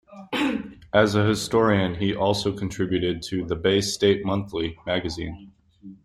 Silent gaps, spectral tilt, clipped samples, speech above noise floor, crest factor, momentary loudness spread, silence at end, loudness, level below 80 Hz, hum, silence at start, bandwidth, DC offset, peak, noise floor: none; -5 dB/octave; under 0.1%; 23 dB; 20 dB; 10 LU; 0.1 s; -24 LUFS; -50 dBFS; none; 0.1 s; 14.5 kHz; under 0.1%; -4 dBFS; -46 dBFS